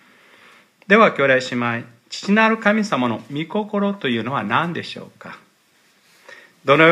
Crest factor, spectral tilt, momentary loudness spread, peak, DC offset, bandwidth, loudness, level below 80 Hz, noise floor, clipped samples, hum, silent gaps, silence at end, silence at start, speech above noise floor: 20 dB; -5.5 dB/octave; 19 LU; 0 dBFS; under 0.1%; 11.5 kHz; -19 LUFS; -70 dBFS; -58 dBFS; under 0.1%; none; none; 0 s; 0.9 s; 40 dB